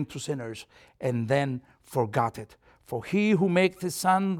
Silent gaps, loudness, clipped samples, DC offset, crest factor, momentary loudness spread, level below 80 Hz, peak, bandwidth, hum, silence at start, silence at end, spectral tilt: none; -27 LUFS; under 0.1%; under 0.1%; 18 dB; 15 LU; -64 dBFS; -10 dBFS; 17 kHz; none; 0 s; 0 s; -6 dB/octave